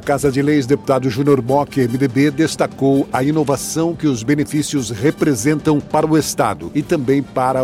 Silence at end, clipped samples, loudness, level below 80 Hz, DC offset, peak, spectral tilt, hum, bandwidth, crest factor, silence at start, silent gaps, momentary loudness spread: 0 s; under 0.1%; -17 LUFS; -46 dBFS; under 0.1%; -2 dBFS; -6 dB/octave; none; 16 kHz; 14 dB; 0 s; none; 4 LU